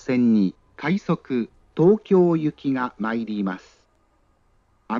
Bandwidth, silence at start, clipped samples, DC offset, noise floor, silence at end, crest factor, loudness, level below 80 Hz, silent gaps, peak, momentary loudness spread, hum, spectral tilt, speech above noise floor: 7.2 kHz; 0.05 s; under 0.1%; under 0.1%; -62 dBFS; 0 s; 16 dB; -22 LUFS; -62 dBFS; none; -6 dBFS; 10 LU; none; -8.5 dB/octave; 42 dB